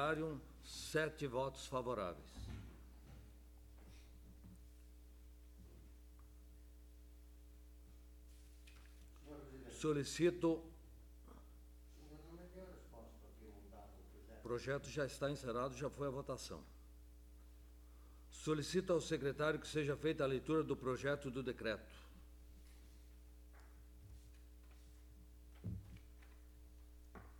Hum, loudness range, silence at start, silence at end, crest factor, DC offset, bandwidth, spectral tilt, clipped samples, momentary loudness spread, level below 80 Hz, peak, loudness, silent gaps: 60 Hz at -60 dBFS; 21 LU; 0 s; 0 s; 22 dB; under 0.1%; 19 kHz; -5.5 dB/octave; under 0.1%; 23 LU; -60 dBFS; -24 dBFS; -43 LUFS; none